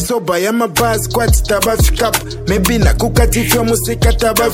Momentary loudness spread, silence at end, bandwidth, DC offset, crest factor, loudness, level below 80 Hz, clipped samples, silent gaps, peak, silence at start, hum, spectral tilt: 3 LU; 0 s; 17 kHz; under 0.1%; 12 dB; -13 LUFS; -18 dBFS; under 0.1%; none; 0 dBFS; 0 s; none; -4.5 dB/octave